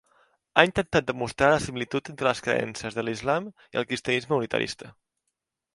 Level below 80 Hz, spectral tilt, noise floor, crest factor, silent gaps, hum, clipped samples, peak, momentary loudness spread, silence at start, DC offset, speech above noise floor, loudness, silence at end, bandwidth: -54 dBFS; -4.5 dB/octave; -82 dBFS; 26 dB; none; none; under 0.1%; 0 dBFS; 10 LU; 0.55 s; under 0.1%; 56 dB; -26 LUFS; 0.85 s; 11.5 kHz